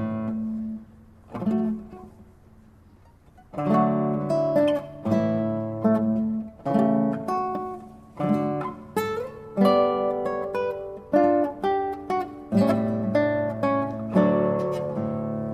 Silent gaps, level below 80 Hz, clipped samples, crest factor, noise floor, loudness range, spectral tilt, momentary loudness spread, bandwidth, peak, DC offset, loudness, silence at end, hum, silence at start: none; -56 dBFS; under 0.1%; 18 dB; -53 dBFS; 4 LU; -8.5 dB/octave; 11 LU; 15 kHz; -6 dBFS; under 0.1%; -25 LUFS; 0 s; none; 0 s